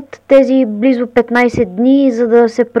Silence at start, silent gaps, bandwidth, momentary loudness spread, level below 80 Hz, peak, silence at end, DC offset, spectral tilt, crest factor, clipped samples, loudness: 0 s; none; 8 kHz; 4 LU; -46 dBFS; 0 dBFS; 0 s; under 0.1%; -6.5 dB/octave; 12 dB; under 0.1%; -11 LUFS